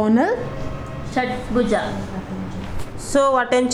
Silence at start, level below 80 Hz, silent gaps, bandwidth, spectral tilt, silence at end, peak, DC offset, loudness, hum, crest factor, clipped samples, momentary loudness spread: 0 s; -38 dBFS; none; 13 kHz; -5.5 dB/octave; 0 s; -4 dBFS; under 0.1%; -22 LUFS; none; 16 dB; under 0.1%; 14 LU